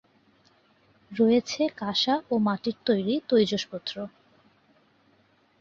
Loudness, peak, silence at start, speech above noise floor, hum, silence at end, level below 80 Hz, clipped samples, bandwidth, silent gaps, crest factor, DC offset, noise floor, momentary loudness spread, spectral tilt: -26 LUFS; -10 dBFS; 1.1 s; 39 dB; none; 1.5 s; -68 dBFS; under 0.1%; 7.4 kHz; none; 18 dB; under 0.1%; -64 dBFS; 12 LU; -5 dB/octave